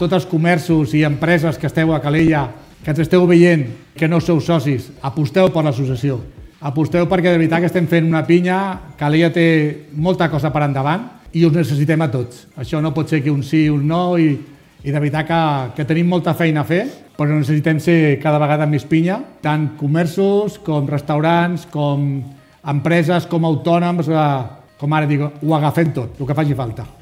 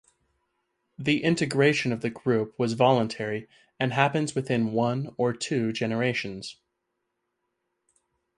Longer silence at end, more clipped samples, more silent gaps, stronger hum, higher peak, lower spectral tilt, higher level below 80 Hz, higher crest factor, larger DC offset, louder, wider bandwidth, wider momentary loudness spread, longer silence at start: second, 0.1 s vs 1.85 s; neither; neither; neither; first, 0 dBFS vs -6 dBFS; first, -7.5 dB/octave vs -5.5 dB/octave; first, -46 dBFS vs -66 dBFS; second, 16 dB vs 22 dB; neither; first, -16 LUFS vs -26 LUFS; first, 15.5 kHz vs 11.5 kHz; about the same, 9 LU vs 10 LU; second, 0 s vs 1 s